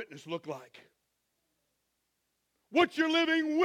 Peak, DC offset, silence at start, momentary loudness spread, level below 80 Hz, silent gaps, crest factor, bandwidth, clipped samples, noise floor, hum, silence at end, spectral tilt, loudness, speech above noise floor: -12 dBFS; under 0.1%; 0 s; 15 LU; -78 dBFS; none; 22 dB; 11 kHz; under 0.1%; -80 dBFS; none; 0 s; -4 dB/octave; -29 LUFS; 51 dB